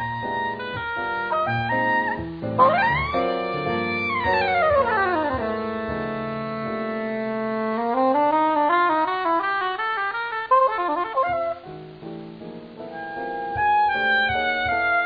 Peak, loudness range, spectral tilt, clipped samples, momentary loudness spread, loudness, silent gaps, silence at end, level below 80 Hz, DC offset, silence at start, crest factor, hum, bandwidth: -4 dBFS; 4 LU; -8 dB/octave; under 0.1%; 11 LU; -22 LUFS; none; 0 s; -50 dBFS; under 0.1%; 0 s; 18 dB; none; 5.2 kHz